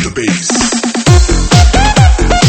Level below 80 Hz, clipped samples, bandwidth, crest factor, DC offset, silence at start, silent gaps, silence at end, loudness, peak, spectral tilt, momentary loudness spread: -12 dBFS; 1%; 10 kHz; 8 dB; under 0.1%; 0 s; none; 0 s; -9 LUFS; 0 dBFS; -4.5 dB/octave; 4 LU